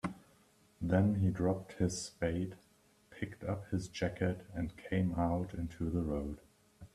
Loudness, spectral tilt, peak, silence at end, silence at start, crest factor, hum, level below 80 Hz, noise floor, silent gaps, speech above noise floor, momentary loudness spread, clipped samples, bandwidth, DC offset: -37 LUFS; -6.5 dB/octave; -16 dBFS; 0.1 s; 0.05 s; 20 dB; none; -56 dBFS; -67 dBFS; none; 32 dB; 12 LU; under 0.1%; 13 kHz; under 0.1%